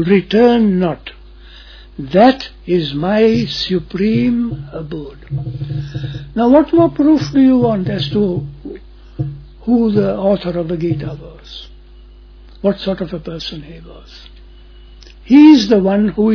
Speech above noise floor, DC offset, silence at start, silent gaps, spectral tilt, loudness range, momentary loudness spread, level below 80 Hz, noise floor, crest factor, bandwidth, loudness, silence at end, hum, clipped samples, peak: 25 dB; under 0.1%; 0 s; none; -7.5 dB/octave; 10 LU; 19 LU; -38 dBFS; -39 dBFS; 14 dB; 5.4 kHz; -14 LUFS; 0 s; none; under 0.1%; 0 dBFS